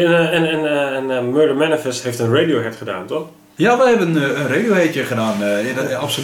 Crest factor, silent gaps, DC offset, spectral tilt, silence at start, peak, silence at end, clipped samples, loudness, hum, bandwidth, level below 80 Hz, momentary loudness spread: 14 dB; none; under 0.1%; -5 dB/octave; 0 s; -4 dBFS; 0 s; under 0.1%; -17 LUFS; none; 17.5 kHz; -62 dBFS; 10 LU